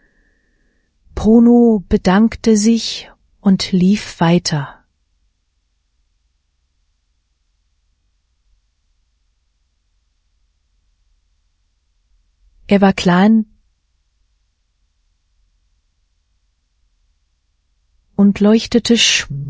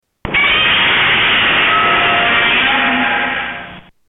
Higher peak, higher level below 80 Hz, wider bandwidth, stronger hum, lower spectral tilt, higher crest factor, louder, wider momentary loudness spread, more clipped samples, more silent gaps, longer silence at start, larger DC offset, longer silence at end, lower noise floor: first, 0 dBFS vs -4 dBFS; about the same, -42 dBFS vs -40 dBFS; second, 8 kHz vs 14 kHz; neither; second, -5 dB/octave vs -6.5 dB/octave; first, 18 dB vs 10 dB; about the same, -13 LUFS vs -11 LUFS; first, 12 LU vs 8 LU; neither; neither; first, 1.15 s vs 0.25 s; neither; second, 0 s vs 0.3 s; first, -65 dBFS vs -33 dBFS